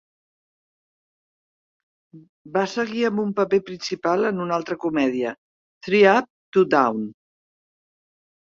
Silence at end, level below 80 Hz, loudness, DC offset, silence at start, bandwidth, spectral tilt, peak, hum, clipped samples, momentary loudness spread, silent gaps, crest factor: 1.35 s; -66 dBFS; -22 LUFS; under 0.1%; 2.15 s; 7.4 kHz; -5.5 dB/octave; -2 dBFS; none; under 0.1%; 12 LU; 2.29-2.45 s, 5.38-5.81 s, 6.30-6.52 s; 20 dB